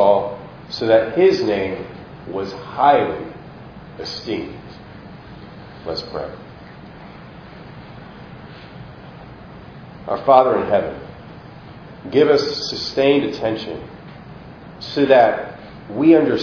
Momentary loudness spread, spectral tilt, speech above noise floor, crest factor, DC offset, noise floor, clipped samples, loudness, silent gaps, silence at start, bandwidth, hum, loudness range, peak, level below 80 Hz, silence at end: 25 LU; -6 dB/octave; 22 dB; 20 dB; under 0.1%; -38 dBFS; under 0.1%; -18 LUFS; none; 0 s; 5.4 kHz; none; 15 LU; 0 dBFS; -50 dBFS; 0 s